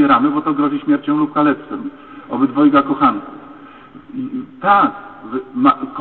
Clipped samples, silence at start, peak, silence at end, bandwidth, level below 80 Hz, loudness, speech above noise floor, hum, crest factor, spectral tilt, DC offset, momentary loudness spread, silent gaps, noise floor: under 0.1%; 0 s; -2 dBFS; 0 s; 4.3 kHz; -56 dBFS; -16 LUFS; 23 dB; none; 14 dB; -10 dB/octave; 0.2%; 18 LU; none; -39 dBFS